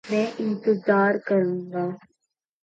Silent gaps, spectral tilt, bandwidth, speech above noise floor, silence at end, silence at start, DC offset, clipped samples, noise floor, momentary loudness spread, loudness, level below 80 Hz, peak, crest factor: none; -7.5 dB/octave; 7.8 kHz; 57 dB; 0.65 s; 0.05 s; under 0.1%; under 0.1%; -80 dBFS; 10 LU; -24 LUFS; -74 dBFS; -8 dBFS; 16 dB